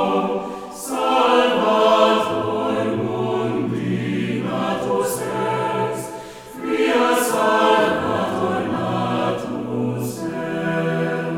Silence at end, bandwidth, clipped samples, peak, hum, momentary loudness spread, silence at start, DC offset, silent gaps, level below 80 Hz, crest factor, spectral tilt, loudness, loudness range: 0 s; 18.5 kHz; under 0.1%; -2 dBFS; none; 10 LU; 0 s; under 0.1%; none; -58 dBFS; 18 dB; -5 dB/octave; -20 LUFS; 4 LU